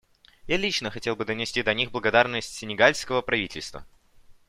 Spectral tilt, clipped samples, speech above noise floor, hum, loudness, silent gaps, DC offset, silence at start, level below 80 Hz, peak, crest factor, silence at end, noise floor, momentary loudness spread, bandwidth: -3.5 dB/octave; under 0.1%; 27 dB; none; -25 LUFS; none; under 0.1%; 0.45 s; -52 dBFS; -4 dBFS; 24 dB; 0.15 s; -53 dBFS; 11 LU; 15 kHz